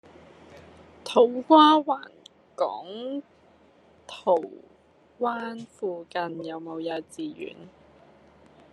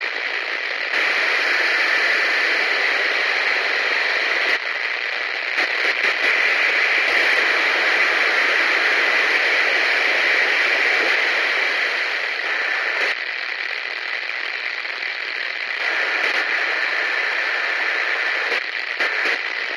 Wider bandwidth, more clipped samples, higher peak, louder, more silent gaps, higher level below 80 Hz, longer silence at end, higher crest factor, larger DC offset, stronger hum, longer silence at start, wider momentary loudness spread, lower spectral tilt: second, 11 kHz vs 13 kHz; neither; first, -2 dBFS vs -6 dBFS; second, -25 LUFS vs -18 LUFS; neither; first, -74 dBFS vs -80 dBFS; first, 1.05 s vs 0 s; first, 24 dB vs 14 dB; neither; neither; first, 0.55 s vs 0 s; first, 22 LU vs 8 LU; first, -5 dB/octave vs 1 dB/octave